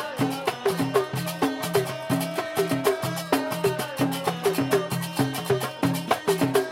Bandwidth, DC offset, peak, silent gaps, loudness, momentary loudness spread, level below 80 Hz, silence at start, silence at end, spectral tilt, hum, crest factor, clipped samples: 17 kHz; under 0.1%; -6 dBFS; none; -26 LUFS; 4 LU; -62 dBFS; 0 s; 0 s; -5 dB/octave; none; 18 dB; under 0.1%